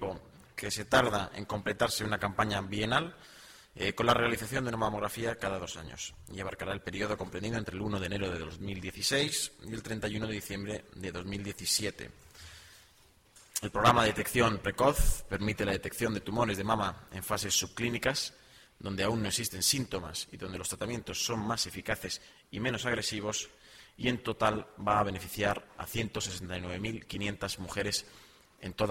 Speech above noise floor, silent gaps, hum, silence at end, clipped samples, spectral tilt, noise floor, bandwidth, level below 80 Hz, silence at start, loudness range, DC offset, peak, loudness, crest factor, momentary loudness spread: 30 dB; none; none; 0 s; under 0.1%; -3.5 dB/octave; -63 dBFS; 16.5 kHz; -46 dBFS; 0 s; 6 LU; under 0.1%; -8 dBFS; -32 LUFS; 24 dB; 13 LU